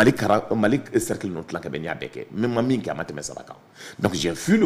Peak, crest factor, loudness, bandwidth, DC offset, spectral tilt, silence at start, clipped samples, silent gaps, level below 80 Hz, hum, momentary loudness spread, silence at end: -6 dBFS; 18 dB; -25 LUFS; 15.5 kHz; under 0.1%; -5.5 dB/octave; 0 s; under 0.1%; none; -54 dBFS; none; 13 LU; 0 s